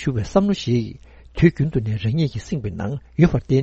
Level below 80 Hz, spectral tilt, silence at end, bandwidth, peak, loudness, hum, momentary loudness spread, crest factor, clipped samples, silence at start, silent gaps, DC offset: -38 dBFS; -7.5 dB/octave; 0 s; 8 kHz; -2 dBFS; -21 LUFS; none; 10 LU; 18 dB; under 0.1%; 0 s; none; under 0.1%